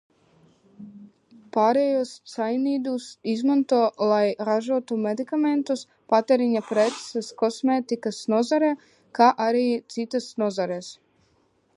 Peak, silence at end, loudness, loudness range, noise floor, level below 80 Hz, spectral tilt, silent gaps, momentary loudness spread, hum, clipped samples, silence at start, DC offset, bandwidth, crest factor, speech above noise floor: -4 dBFS; 0.85 s; -24 LUFS; 2 LU; -65 dBFS; -78 dBFS; -5 dB/octave; none; 10 LU; none; under 0.1%; 0.8 s; under 0.1%; 11.5 kHz; 20 dB; 42 dB